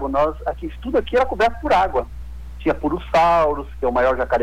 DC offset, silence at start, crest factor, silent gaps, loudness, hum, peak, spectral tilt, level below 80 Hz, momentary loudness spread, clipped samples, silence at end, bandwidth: under 0.1%; 0 s; 10 dB; none; -20 LUFS; none; -10 dBFS; -6.5 dB/octave; -34 dBFS; 11 LU; under 0.1%; 0 s; 18 kHz